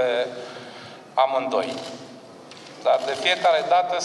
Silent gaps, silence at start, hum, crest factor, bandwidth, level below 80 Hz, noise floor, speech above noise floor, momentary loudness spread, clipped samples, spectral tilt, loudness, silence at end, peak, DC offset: none; 0 s; none; 18 dB; 12 kHz; -76 dBFS; -43 dBFS; 21 dB; 22 LU; under 0.1%; -2.5 dB/octave; -22 LUFS; 0 s; -6 dBFS; under 0.1%